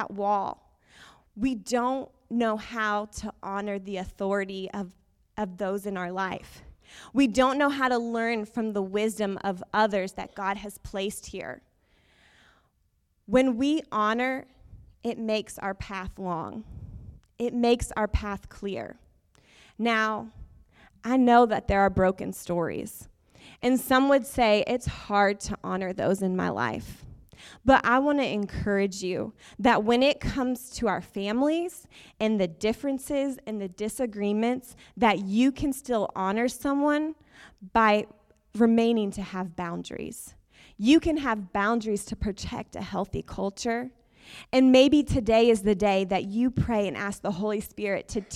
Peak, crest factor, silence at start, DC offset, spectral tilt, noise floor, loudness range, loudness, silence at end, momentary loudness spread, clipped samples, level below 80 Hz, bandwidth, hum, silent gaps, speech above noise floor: -6 dBFS; 20 dB; 0 s; under 0.1%; -5.5 dB/octave; -70 dBFS; 7 LU; -27 LUFS; 0 s; 14 LU; under 0.1%; -48 dBFS; 15 kHz; none; none; 44 dB